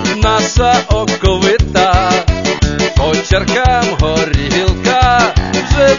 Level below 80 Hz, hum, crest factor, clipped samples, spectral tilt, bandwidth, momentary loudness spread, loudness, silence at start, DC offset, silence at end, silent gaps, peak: -18 dBFS; none; 12 dB; under 0.1%; -4.5 dB/octave; 7.4 kHz; 4 LU; -12 LUFS; 0 s; 0.5%; 0 s; none; 0 dBFS